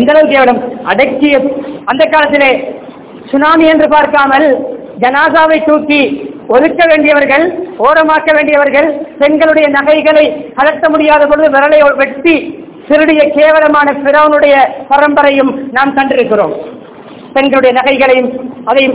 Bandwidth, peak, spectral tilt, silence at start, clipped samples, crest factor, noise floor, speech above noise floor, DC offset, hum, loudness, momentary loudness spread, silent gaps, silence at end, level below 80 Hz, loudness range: 4 kHz; 0 dBFS; -8 dB/octave; 0 s; 5%; 8 dB; -29 dBFS; 21 dB; 0.2%; none; -8 LUFS; 9 LU; none; 0 s; -44 dBFS; 2 LU